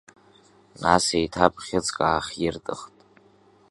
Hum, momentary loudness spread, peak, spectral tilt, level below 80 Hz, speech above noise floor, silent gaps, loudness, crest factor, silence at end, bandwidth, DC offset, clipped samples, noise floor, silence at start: none; 13 LU; 0 dBFS; -3.5 dB/octave; -50 dBFS; 33 dB; none; -24 LUFS; 26 dB; 0.85 s; 11.5 kHz; under 0.1%; under 0.1%; -57 dBFS; 0.8 s